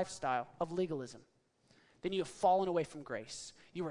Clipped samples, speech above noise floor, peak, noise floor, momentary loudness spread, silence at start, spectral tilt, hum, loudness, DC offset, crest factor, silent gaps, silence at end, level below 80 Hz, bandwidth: under 0.1%; 33 dB; -20 dBFS; -70 dBFS; 15 LU; 0 s; -5 dB/octave; none; -37 LUFS; under 0.1%; 18 dB; none; 0 s; -70 dBFS; 11 kHz